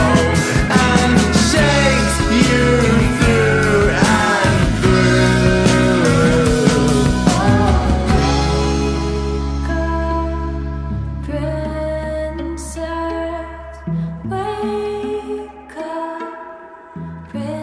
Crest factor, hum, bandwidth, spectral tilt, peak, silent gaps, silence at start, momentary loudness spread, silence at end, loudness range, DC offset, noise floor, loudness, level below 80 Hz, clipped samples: 16 dB; none; 11 kHz; -5.5 dB/octave; 0 dBFS; none; 0 s; 14 LU; 0 s; 11 LU; under 0.1%; -36 dBFS; -16 LUFS; -24 dBFS; under 0.1%